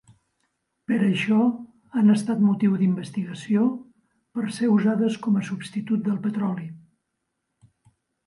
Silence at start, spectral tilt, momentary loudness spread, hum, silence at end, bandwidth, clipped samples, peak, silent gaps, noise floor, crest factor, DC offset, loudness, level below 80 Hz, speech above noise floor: 0.9 s; -7.5 dB/octave; 11 LU; none; 1.5 s; 11 kHz; under 0.1%; -8 dBFS; none; -79 dBFS; 16 dB; under 0.1%; -23 LUFS; -70 dBFS; 56 dB